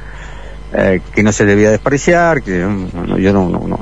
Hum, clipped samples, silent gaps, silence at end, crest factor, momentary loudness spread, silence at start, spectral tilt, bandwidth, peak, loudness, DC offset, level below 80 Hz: none; under 0.1%; none; 0 s; 12 dB; 17 LU; 0 s; -6 dB/octave; 9.6 kHz; 0 dBFS; -13 LUFS; 2%; -30 dBFS